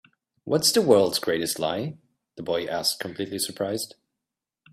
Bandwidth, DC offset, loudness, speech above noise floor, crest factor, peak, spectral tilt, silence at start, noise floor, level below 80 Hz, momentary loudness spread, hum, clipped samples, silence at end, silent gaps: 16 kHz; under 0.1%; -24 LUFS; 62 dB; 22 dB; -4 dBFS; -3.5 dB/octave; 0.45 s; -87 dBFS; -66 dBFS; 14 LU; none; under 0.1%; 0.85 s; none